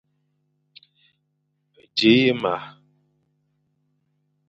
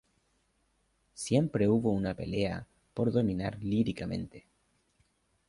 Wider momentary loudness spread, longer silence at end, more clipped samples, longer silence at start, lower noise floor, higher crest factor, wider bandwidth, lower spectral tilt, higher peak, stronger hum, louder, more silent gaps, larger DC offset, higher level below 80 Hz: about the same, 15 LU vs 13 LU; first, 1.8 s vs 1.1 s; neither; first, 1.95 s vs 1.15 s; about the same, -73 dBFS vs -74 dBFS; about the same, 22 dB vs 20 dB; second, 8.2 kHz vs 11.5 kHz; about the same, -6 dB/octave vs -7 dB/octave; first, -4 dBFS vs -14 dBFS; first, 50 Hz at -50 dBFS vs none; first, -20 LUFS vs -31 LUFS; neither; neither; second, -68 dBFS vs -56 dBFS